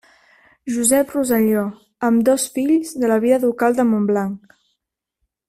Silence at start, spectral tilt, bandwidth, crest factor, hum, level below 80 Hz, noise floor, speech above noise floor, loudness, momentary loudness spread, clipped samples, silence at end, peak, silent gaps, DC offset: 0.65 s; -5 dB/octave; 16 kHz; 16 dB; none; -58 dBFS; -78 dBFS; 60 dB; -18 LUFS; 10 LU; under 0.1%; 1.1 s; -2 dBFS; none; under 0.1%